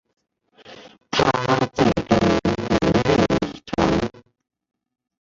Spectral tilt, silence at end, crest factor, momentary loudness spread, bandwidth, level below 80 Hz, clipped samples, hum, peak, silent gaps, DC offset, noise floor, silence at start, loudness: -6 dB/octave; 1.1 s; 18 dB; 6 LU; 7.8 kHz; -40 dBFS; under 0.1%; none; -4 dBFS; none; under 0.1%; -55 dBFS; 0.65 s; -20 LUFS